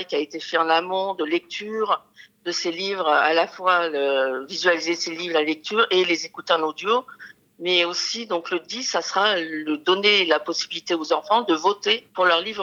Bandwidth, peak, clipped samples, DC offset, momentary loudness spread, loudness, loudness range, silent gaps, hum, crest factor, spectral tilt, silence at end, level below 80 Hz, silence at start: 10.5 kHz; -2 dBFS; under 0.1%; under 0.1%; 7 LU; -22 LUFS; 2 LU; none; none; 20 dB; -2 dB/octave; 0 s; -80 dBFS; 0 s